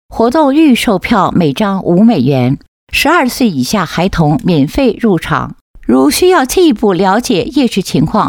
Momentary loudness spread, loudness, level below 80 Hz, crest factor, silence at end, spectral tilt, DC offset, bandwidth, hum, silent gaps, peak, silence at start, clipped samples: 5 LU; -11 LUFS; -34 dBFS; 10 dB; 0 s; -5.5 dB/octave; under 0.1%; 18.5 kHz; none; 2.68-2.87 s, 5.61-5.74 s; 0 dBFS; 0.1 s; under 0.1%